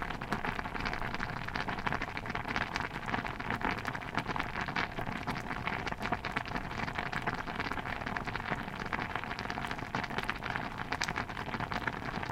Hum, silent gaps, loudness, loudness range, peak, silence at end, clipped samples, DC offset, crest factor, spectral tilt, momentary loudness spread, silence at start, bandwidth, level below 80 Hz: none; none; -36 LUFS; 1 LU; -12 dBFS; 0 s; under 0.1%; under 0.1%; 26 dB; -5 dB/octave; 3 LU; 0 s; 16.5 kHz; -48 dBFS